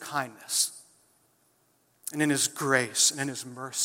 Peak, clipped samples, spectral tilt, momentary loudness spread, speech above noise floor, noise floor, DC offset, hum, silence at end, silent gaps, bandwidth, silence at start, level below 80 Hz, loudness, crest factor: -8 dBFS; under 0.1%; -2 dB/octave; 13 LU; 40 dB; -68 dBFS; under 0.1%; none; 0 s; none; 16.5 kHz; 0 s; -80 dBFS; -27 LUFS; 22 dB